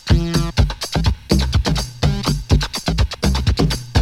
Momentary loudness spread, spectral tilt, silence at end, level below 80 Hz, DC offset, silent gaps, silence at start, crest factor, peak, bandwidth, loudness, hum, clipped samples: 3 LU; -5.5 dB/octave; 0 s; -22 dBFS; under 0.1%; none; 0.05 s; 16 dB; -2 dBFS; 16 kHz; -19 LUFS; none; under 0.1%